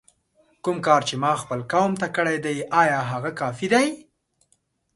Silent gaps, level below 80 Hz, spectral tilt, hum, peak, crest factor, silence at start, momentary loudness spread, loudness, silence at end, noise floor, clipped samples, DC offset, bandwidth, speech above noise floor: none; -64 dBFS; -5 dB/octave; none; -2 dBFS; 20 dB; 0.65 s; 8 LU; -22 LUFS; 0.95 s; -68 dBFS; under 0.1%; under 0.1%; 11.5 kHz; 46 dB